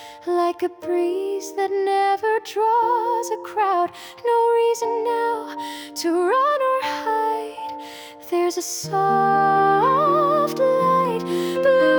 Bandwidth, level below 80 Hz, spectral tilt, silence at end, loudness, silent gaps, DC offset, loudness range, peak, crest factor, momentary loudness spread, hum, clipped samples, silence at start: over 20 kHz; -68 dBFS; -4.5 dB/octave; 0 s; -21 LUFS; none; under 0.1%; 4 LU; -6 dBFS; 14 dB; 10 LU; none; under 0.1%; 0 s